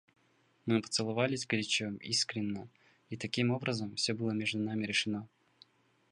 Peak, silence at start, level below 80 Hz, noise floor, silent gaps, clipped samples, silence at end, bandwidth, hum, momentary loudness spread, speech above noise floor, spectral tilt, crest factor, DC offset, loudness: -14 dBFS; 0.65 s; -72 dBFS; -71 dBFS; none; under 0.1%; 0.85 s; 11.5 kHz; none; 9 LU; 37 dB; -4 dB/octave; 22 dB; under 0.1%; -34 LUFS